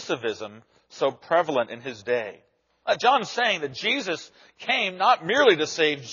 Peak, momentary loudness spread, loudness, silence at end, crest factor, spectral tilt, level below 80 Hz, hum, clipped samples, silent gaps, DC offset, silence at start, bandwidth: -4 dBFS; 15 LU; -23 LUFS; 0 s; 20 dB; -0.5 dB/octave; -74 dBFS; none; under 0.1%; none; under 0.1%; 0 s; 7.2 kHz